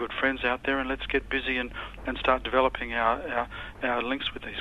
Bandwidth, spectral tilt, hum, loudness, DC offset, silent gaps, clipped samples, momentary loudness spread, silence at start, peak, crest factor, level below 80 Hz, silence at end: 12.5 kHz; -6 dB/octave; none; -28 LUFS; under 0.1%; none; under 0.1%; 7 LU; 0 s; -8 dBFS; 22 dB; -44 dBFS; 0 s